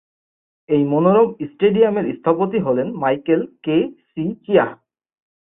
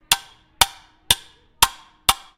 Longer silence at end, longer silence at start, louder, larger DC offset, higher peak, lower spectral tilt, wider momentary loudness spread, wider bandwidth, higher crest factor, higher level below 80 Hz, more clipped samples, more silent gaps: first, 0.75 s vs 0.2 s; first, 0.7 s vs 0.1 s; about the same, -18 LUFS vs -20 LUFS; neither; about the same, -2 dBFS vs 0 dBFS; first, -12 dB/octave vs 0.5 dB/octave; first, 9 LU vs 2 LU; second, 3.8 kHz vs over 20 kHz; second, 18 dB vs 24 dB; second, -60 dBFS vs -42 dBFS; neither; neither